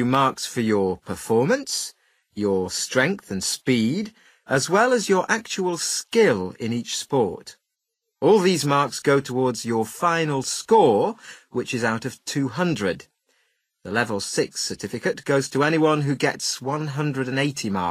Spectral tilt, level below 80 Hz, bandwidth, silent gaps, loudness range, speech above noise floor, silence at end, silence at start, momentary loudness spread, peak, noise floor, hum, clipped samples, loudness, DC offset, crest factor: -4.5 dB/octave; -64 dBFS; 15.5 kHz; none; 4 LU; 58 dB; 0 s; 0 s; 9 LU; -4 dBFS; -80 dBFS; none; under 0.1%; -22 LUFS; under 0.1%; 20 dB